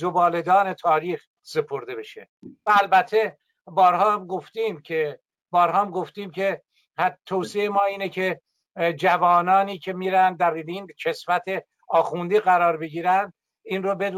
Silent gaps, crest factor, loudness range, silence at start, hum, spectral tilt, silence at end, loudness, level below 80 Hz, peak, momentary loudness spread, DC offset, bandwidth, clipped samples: 1.27-1.37 s, 2.29-2.42 s; 18 dB; 3 LU; 0 s; none; -5.5 dB/octave; 0 s; -22 LUFS; -76 dBFS; -6 dBFS; 13 LU; under 0.1%; 15.5 kHz; under 0.1%